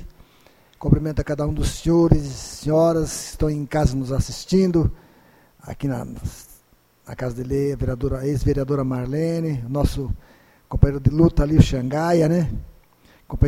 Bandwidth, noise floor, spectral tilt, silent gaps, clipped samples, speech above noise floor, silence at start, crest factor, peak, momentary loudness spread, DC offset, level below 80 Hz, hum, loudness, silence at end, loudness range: 15.5 kHz; -57 dBFS; -7 dB/octave; none; under 0.1%; 37 dB; 0 s; 20 dB; 0 dBFS; 14 LU; under 0.1%; -30 dBFS; none; -21 LUFS; 0 s; 6 LU